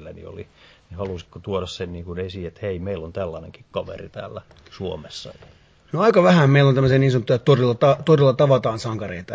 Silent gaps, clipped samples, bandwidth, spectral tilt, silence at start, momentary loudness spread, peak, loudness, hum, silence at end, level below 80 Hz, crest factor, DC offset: none; under 0.1%; 8 kHz; -7.5 dB/octave; 0 s; 20 LU; -2 dBFS; -19 LUFS; none; 0 s; -46 dBFS; 18 dB; under 0.1%